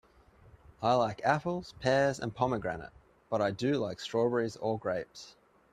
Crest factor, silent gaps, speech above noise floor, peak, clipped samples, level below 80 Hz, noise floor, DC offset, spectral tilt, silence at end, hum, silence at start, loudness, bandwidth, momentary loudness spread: 20 dB; none; 29 dB; -12 dBFS; under 0.1%; -62 dBFS; -60 dBFS; under 0.1%; -6 dB/octave; 0.45 s; none; 0.8 s; -32 LUFS; 13 kHz; 12 LU